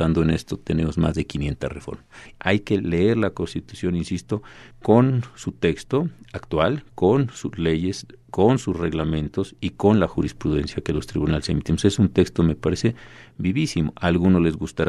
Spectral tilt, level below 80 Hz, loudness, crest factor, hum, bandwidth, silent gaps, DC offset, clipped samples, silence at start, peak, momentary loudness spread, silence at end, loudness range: -7 dB/octave; -40 dBFS; -22 LUFS; 20 dB; none; 12 kHz; none; under 0.1%; under 0.1%; 0 s; -2 dBFS; 11 LU; 0 s; 2 LU